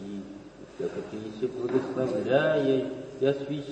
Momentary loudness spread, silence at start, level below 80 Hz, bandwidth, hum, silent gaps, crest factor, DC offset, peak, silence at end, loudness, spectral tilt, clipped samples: 16 LU; 0 s; -64 dBFS; 8.6 kHz; none; none; 18 dB; under 0.1%; -12 dBFS; 0 s; -28 LUFS; -7 dB/octave; under 0.1%